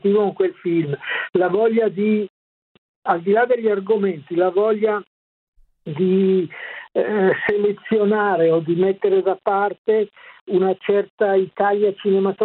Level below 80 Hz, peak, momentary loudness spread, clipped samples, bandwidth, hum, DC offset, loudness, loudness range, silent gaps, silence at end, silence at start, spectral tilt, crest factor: -66 dBFS; -4 dBFS; 6 LU; under 0.1%; 4.2 kHz; none; under 0.1%; -19 LUFS; 2 LU; 2.30-3.02 s, 5.07-5.53 s, 9.78-9.85 s, 10.41-10.46 s, 11.10-11.18 s; 0 s; 0.05 s; -10.5 dB/octave; 16 dB